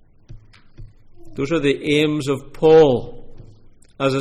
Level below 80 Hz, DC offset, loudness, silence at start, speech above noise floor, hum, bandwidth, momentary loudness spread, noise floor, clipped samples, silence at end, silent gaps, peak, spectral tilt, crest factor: -42 dBFS; under 0.1%; -17 LUFS; 0.3 s; 29 dB; none; 12 kHz; 15 LU; -46 dBFS; under 0.1%; 0 s; none; -4 dBFS; -6 dB/octave; 16 dB